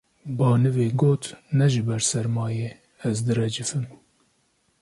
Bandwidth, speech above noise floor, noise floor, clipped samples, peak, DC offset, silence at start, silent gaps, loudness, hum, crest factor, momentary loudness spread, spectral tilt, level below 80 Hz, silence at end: 11.5 kHz; 45 dB; -67 dBFS; under 0.1%; -8 dBFS; under 0.1%; 0.25 s; none; -24 LUFS; none; 16 dB; 11 LU; -5.5 dB/octave; -60 dBFS; 0.85 s